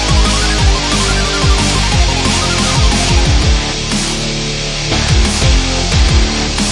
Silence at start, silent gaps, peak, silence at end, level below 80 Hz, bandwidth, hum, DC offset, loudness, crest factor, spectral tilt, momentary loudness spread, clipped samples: 0 s; none; 0 dBFS; 0 s; -16 dBFS; 11.5 kHz; none; under 0.1%; -12 LUFS; 12 dB; -3.5 dB/octave; 4 LU; under 0.1%